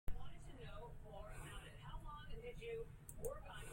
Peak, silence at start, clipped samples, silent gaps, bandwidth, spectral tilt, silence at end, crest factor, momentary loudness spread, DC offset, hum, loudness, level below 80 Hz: -30 dBFS; 0.05 s; under 0.1%; none; 16.5 kHz; -4.5 dB/octave; 0 s; 18 dB; 6 LU; under 0.1%; none; -54 LUFS; -54 dBFS